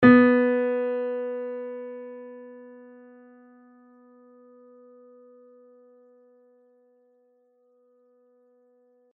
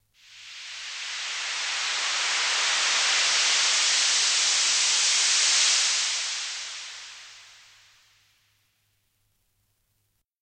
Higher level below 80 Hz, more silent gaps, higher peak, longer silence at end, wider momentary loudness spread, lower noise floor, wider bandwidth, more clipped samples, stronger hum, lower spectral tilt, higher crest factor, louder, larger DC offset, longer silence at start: first, -68 dBFS vs -80 dBFS; neither; first, -2 dBFS vs -12 dBFS; first, 6.5 s vs 2.95 s; first, 29 LU vs 17 LU; second, -65 dBFS vs -74 dBFS; second, 4.3 kHz vs 16 kHz; neither; neither; first, -5.5 dB/octave vs 5 dB/octave; first, 24 dB vs 16 dB; about the same, -23 LUFS vs -21 LUFS; neither; second, 0 s vs 0.3 s